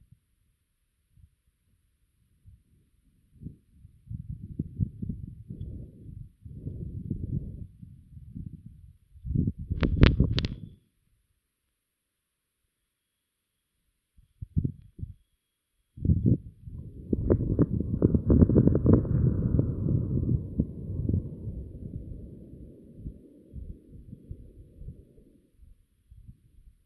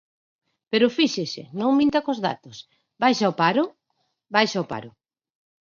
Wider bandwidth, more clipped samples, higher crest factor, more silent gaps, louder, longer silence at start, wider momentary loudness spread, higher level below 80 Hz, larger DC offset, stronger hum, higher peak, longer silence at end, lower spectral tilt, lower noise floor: second, 6 kHz vs 7.4 kHz; neither; first, 30 dB vs 20 dB; neither; second, -28 LUFS vs -22 LUFS; first, 3.4 s vs 0.7 s; first, 25 LU vs 12 LU; first, -38 dBFS vs -66 dBFS; neither; neither; first, 0 dBFS vs -4 dBFS; second, 0.55 s vs 0.8 s; first, -9.5 dB/octave vs -5 dB/octave; first, -82 dBFS vs -74 dBFS